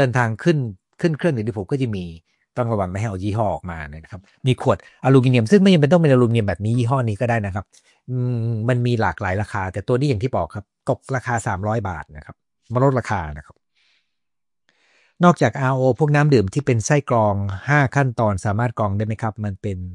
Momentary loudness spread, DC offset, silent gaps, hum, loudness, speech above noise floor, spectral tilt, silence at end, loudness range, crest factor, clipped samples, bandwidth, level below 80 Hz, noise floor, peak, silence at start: 13 LU; under 0.1%; none; none; -20 LUFS; 69 dB; -7 dB/octave; 0 s; 7 LU; 18 dB; under 0.1%; 11 kHz; -50 dBFS; -88 dBFS; -2 dBFS; 0 s